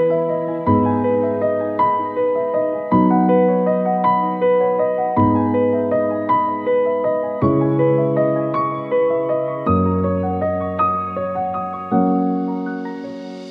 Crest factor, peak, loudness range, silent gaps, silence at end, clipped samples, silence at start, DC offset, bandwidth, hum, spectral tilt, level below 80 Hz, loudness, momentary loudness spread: 14 dB; -4 dBFS; 3 LU; none; 0 s; under 0.1%; 0 s; under 0.1%; 5.2 kHz; none; -10.5 dB/octave; -50 dBFS; -18 LUFS; 6 LU